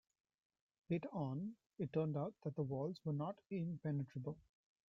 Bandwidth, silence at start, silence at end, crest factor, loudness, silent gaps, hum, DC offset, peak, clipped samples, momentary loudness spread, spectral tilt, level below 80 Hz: 6 kHz; 0.9 s; 0.45 s; 18 dB; -44 LUFS; none; none; under 0.1%; -28 dBFS; under 0.1%; 7 LU; -9 dB/octave; -78 dBFS